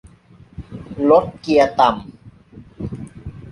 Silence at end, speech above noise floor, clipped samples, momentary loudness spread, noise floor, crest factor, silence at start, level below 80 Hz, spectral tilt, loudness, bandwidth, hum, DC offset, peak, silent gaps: 0 s; 32 dB; under 0.1%; 21 LU; -47 dBFS; 18 dB; 0.6 s; -44 dBFS; -6.5 dB/octave; -16 LUFS; 11.5 kHz; none; under 0.1%; -2 dBFS; none